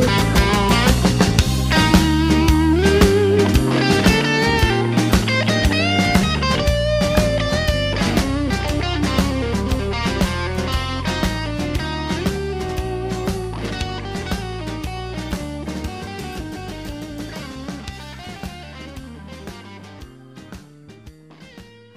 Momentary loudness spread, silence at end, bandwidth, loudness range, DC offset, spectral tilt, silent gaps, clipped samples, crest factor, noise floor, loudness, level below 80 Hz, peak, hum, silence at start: 18 LU; 0.35 s; 16 kHz; 18 LU; under 0.1%; -5 dB/octave; none; under 0.1%; 18 dB; -43 dBFS; -18 LUFS; -28 dBFS; 0 dBFS; none; 0 s